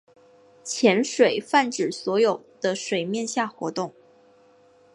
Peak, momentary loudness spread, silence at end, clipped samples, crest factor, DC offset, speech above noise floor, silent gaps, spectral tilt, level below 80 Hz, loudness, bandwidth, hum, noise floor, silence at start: -4 dBFS; 11 LU; 1.05 s; under 0.1%; 20 dB; under 0.1%; 33 dB; none; -3.5 dB/octave; -76 dBFS; -24 LUFS; 11.5 kHz; none; -56 dBFS; 0.65 s